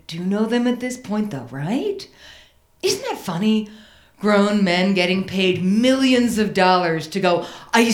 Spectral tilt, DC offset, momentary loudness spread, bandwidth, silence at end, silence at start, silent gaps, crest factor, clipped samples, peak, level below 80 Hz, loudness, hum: -5 dB/octave; under 0.1%; 10 LU; 17 kHz; 0 s; 0.1 s; none; 18 dB; under 0.1%; -2 dBFS; -56 dBFS; -19 LUFS; none